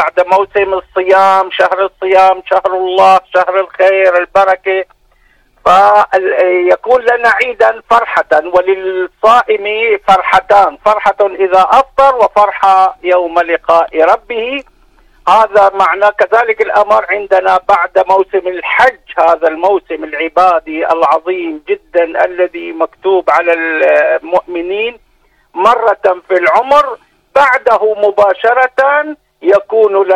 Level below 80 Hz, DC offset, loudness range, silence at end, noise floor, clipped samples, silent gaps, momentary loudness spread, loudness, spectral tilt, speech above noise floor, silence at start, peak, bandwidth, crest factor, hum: -48 dBFS; under 0.1%; 3 LU; 0 s; -52 dBFS; 0.3%; none; 8 LU; -10 LUFS; -4 dB/octave; 42 dB; 0 s; 0 dBFS; 12 kHz; 10 dB; none